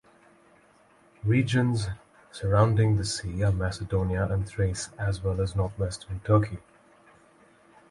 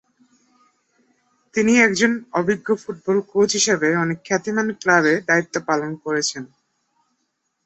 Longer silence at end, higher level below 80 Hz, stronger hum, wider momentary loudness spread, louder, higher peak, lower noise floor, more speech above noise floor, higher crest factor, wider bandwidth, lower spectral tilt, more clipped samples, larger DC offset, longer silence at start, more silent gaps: about the same, 1.3 s vs 1.2 s; first, -42 dBFS vs -62 dBFS; neither; first, 11 LU vs 8 LU; second, -27 LUFS vs -19 LUFS; second, -8 dBFS vs -2 dBFS; second, -59 dBFS vs -73 dBFS; second, 34 dB vs 54 dB; about the same, 20 dB vs 20 dB; first, 11.5 kHz vs 8.2 kHz; first, -6.5 dB/octave vs -3.5 dB/octave; neither; neither; second, 1.25 s vs 1.55 s; neither